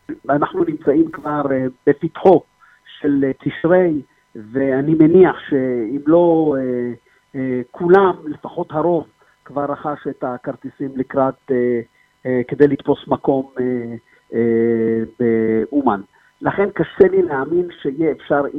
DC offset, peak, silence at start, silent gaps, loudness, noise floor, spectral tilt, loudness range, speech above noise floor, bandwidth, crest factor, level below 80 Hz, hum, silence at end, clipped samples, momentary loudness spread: under 0.1%; 0 dBFS; 0.1 s; none; -18 LUFS; -45 dBFS; -10 dB/octave; 6 LU; 29 dB; 4 kHz; 18 dB; -54 dBFS; none; 0 s; under 0.1%; 12 LU